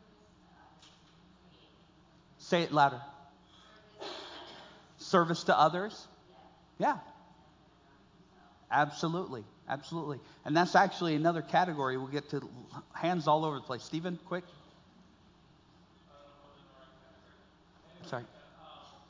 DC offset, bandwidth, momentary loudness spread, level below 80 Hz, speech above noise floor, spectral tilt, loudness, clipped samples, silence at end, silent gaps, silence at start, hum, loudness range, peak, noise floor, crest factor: under 0.1%; 7.6 kHz; 23 LU; -72 dBFS; 31 dB; -5.5 dB/octave; -32 LUFS; under 0.1%; 0.2 s; none; 2.4 s; none; 13 LU; -10 dBFS; -62 dBFS; 26 dB